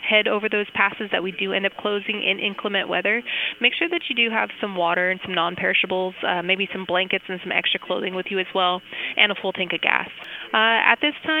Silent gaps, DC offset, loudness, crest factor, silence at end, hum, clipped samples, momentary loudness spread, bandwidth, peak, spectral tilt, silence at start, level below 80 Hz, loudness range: none; under 0.1%; -21 LUFS; 22 dB; 0 s; none; under 0.1%; 7 LU; 15.5 kHz; 0 dBFS; -5.5 dB/octave; 0 s; -68 dBFS; 2 LU